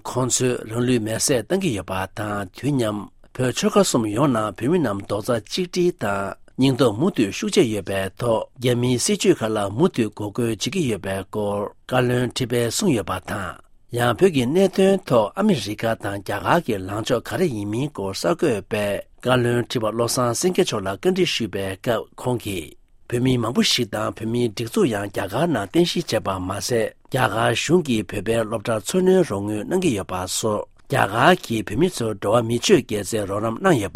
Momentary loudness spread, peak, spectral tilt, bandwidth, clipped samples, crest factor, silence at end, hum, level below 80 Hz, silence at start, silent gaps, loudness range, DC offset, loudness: 8 LU; 0 dBFS; -5 dB/octave; 16 kHz; under 0.1%; 20 dB; 0.05 s; none; -50 dBFS; 0.05 s; none; 3 LU; under 0.1%; -21 LUFS